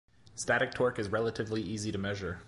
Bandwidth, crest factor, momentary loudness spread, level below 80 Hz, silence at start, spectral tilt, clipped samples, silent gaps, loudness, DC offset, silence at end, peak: 11.5 kHz; 18 dB; 6 LU; -56 dBFS; 0.35 s; -4.5 dB/octave; under 0.1%; none; -33 LUFS; under 0.1%; 0 s; -16 dBFS